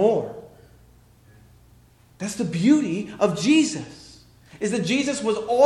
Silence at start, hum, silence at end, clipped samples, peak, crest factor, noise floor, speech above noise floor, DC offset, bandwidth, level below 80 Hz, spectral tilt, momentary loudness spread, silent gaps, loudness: 0 s; none; 0 s; under 0.1%; -6 dBFS; 18 dB; -54 dBFS; 33 dB; under 0.1%; 12.5 kHz; -58 dBFS; -5 dB/octave; 16 LU; none; -23 LUFS